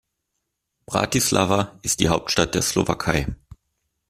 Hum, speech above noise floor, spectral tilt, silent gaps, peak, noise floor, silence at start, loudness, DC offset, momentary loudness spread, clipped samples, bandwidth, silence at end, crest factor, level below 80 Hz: none; 57 dB; -3.5 dB/octave; none; -2 dBFS; -78 dBFS; 0.9 s; -21 LUFS; under 0.1%; 7 LU; under 0.1%; 15.5 kHz; 0.75 s; 22 dB; -42 dBFS